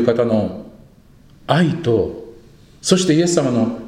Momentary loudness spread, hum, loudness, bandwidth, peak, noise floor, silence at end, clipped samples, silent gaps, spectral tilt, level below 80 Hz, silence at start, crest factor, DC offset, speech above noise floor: 15 LU; none; -17 LUFS; 14.5 kHz; 0 dBFS; -47 dBFS; 0 s; under 0.1%; none; -5.5 dB/octave; -48 dBFS; 0 s; 18 dB; under 0.1%; 31 dB